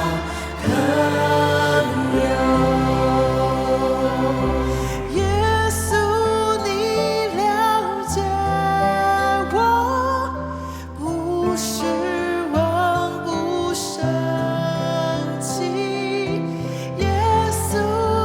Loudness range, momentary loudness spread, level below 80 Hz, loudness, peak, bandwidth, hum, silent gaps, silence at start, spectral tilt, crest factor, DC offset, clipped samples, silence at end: 4 LU; 6 LU; -36 dBFS; -20 LUFS; -6 dBFS; 19 kHz; none; none; 0 s; -5 dB/octave; 14 dB; under 0.1%; under 0.1%; 0 s